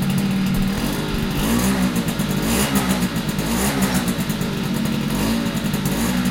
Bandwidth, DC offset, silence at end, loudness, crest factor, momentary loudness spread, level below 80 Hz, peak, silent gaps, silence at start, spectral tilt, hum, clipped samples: 17 kHz; under 0.1%; 0 s; -20 LUFS; 14 dB; 4 LU; -32 dBFS; -6 dBFS; none; 0 s; -5 dB/octave; none; under 0.1%